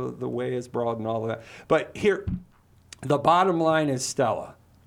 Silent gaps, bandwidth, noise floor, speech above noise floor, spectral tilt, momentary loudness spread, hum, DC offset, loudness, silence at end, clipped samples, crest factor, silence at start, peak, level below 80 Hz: none; 16 kHz; -51 dBFS; 27 dB; -5 dB/octave; 14 LU; none; under 0.1%; -25 LUFS; 0.35 s; under 0.1%; 20 dB; 0 s; -6 dBFS; -50 dBFS